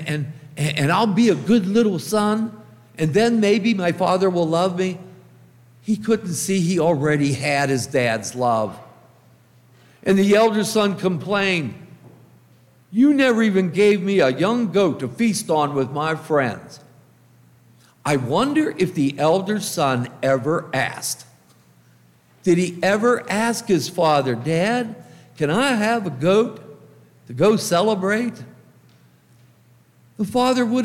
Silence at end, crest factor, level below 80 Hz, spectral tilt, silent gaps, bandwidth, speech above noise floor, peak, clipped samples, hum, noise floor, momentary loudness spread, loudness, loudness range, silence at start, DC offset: 0 s; 16 dB; -62 dBFS; -5.5 dB/octave; none; 16.5 kHz; 35 dB; -4 dBFS; under 0.1%; none; -54 dBFS; 9 LU; -20 LUFS; 4 LU; 0 s; under 0.1%